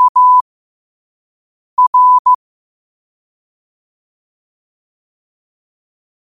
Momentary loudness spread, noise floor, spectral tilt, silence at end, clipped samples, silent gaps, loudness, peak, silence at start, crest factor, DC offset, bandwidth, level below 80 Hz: 8 LU; under -90 dBFS; -1 dB/octave; 3.9 s; under 0.1%; 0.09-0.15 s, 0.41-1.77 s, 1.87-1.93 s, 2.19-2.25 s; -10 LUFS; -4 dBFS; 0 s; 12 dB; under 0.1%; 1.3 kHz; -70 dBFS